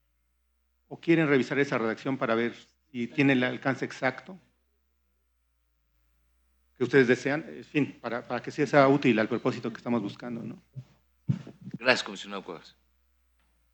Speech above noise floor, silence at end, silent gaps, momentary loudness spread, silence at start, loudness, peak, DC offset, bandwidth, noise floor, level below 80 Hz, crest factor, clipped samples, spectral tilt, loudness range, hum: 46 dB; 1.05 s; none; 19 LU; 0.9 s; -27 LUFS; -4 dBFS; under 0.1%; 19 kHz; -73 dBFS; -70 dBFS; 24 dB; under 0.1%; -6 dB/octave; 7 LU; none